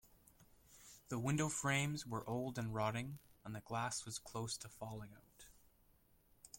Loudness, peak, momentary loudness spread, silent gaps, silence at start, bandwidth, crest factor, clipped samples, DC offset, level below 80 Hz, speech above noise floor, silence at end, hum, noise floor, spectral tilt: -42 LUFS; -24 dBFS; 22 LU; none; 0.05 s; 16.5 kHz; 20 dB; under 0.1%; under 0.1%; -70 dBFS; 30 dB; 0 s; none; -72 dBFS; -4.5 dB/octave